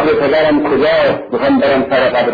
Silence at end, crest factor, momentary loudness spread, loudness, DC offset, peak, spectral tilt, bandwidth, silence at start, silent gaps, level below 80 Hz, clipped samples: 0 s; 10 dB; 3 LU; -12 LUFS; under 0.1%; -2 dBFS; -7.5 dB/octave; 5 kHz; 0 s; none; -44 dBFS; under 0.1%